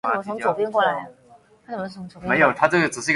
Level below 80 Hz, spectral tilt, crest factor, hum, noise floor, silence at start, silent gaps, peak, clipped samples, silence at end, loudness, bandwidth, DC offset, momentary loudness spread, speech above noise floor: -60 dBFS; -4.5 dB/octave; 22 dB; none; -52 dBFS; 0.05 s; none; 0 dBFS; under 0.1%; 0 s; -21 LUFS; 11.5 kHz; under 0.1%; 16 LU; 30 dB